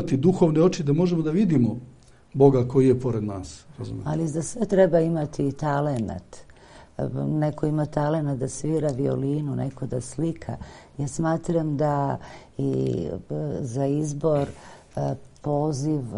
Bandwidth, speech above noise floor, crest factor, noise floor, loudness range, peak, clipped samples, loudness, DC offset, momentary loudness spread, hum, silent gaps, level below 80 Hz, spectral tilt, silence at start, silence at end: 11 kHz; 25 dB; 22 dB; -49 dBFS; 5 LU; -2 dBFS; under 0.1%; -24 LUFS; under 0.1%; 13 LU; none; none; -48 dBFS; -7.5 dB/octave; 0 s; 0 s